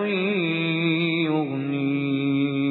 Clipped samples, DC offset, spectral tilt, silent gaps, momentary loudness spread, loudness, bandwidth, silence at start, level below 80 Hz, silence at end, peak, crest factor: under 0.1%; under 0.1%; -9.5 dB/octave; none; 3 LU; -23 LUFS; 4.2 kHz; 0 s; -74 dBFS; 0 s; -12 dBFS; 12 dB